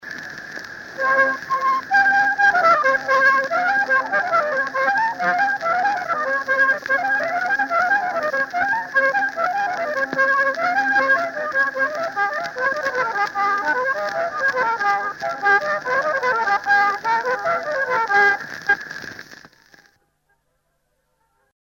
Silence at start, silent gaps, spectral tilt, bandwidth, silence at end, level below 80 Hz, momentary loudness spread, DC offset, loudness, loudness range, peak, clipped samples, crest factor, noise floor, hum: 0 s; none; -3 dB/octave; 16.5 kHz; 2.45 s; -64 dBFS; 7 LU; under 0.1%; -19 LUFS; 4 LU; -4 dBFS; under 0.1%; 16 dB; -69 dBFS; none